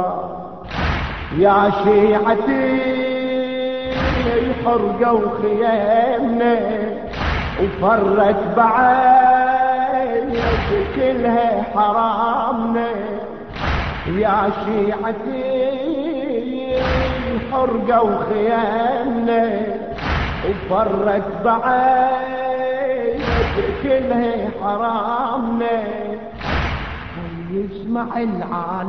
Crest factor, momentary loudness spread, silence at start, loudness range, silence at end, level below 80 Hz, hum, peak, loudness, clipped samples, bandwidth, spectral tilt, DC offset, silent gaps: 16 dB; 9 LU; 0 s; 5 LU; 0 s; -34 dBFS; none; -2 dBFS; -18 LUFS; under 0.1%; 6.4 kHz; -8 dB/octave; 0.5%; none